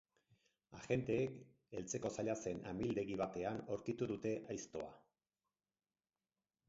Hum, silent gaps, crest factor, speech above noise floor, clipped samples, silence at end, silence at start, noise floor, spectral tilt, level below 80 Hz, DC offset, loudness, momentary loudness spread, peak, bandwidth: none; none; 20 dB; over 48 dB; under 0.1%; 1.7 s; 0.7 s; under -90 dBFS; -6.5 dB/octave; -70 dBFS; under 0.1%; -43 LUFS; 11 LU; -26 dBFS; 7.6 kHz